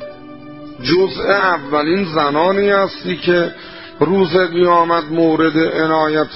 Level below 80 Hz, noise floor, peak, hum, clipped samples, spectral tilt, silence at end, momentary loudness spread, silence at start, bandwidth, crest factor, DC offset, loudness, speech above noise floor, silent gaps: -50 dBFS; -34 dBFS; 0 dBFS; none; under 0.1%; -9.5 dB/octave; 0 s; 19 LU; 0 s; 5.8 kHz; 14 dB; 0.6%; -15 LUFS; 20 dB; none